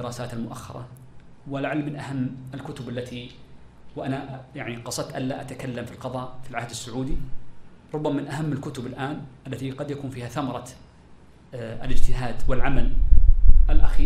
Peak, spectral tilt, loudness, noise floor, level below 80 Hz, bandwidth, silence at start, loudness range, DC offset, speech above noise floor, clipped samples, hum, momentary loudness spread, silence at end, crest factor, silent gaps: 0 dBFS; -6 dB/octave; -29 LUFS; -49 dBFS; -24 dBFS; 9.8 kHz; 0 s; 6 LU; under 0.1%; 28 dB; under 0.1%; none; 15 LU; 0 s; 18 dB; none